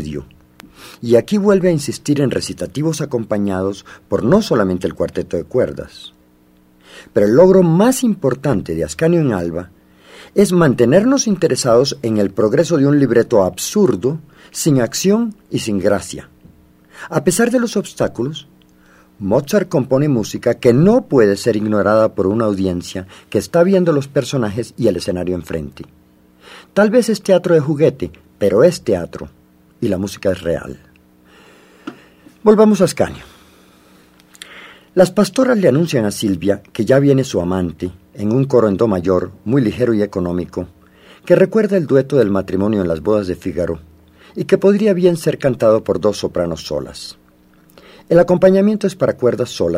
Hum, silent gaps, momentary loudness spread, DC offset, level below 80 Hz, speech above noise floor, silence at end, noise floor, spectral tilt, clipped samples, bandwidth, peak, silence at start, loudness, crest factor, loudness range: none; none; 14 LU; under 0.1%; -46 dBFS; 36 dB; 0 s; -51 dBFS; -6 dB/octave; under 0.1%; 16 kHz; 0 dBFS; 0 s; -15 LUFS; 16 dB; 4 LU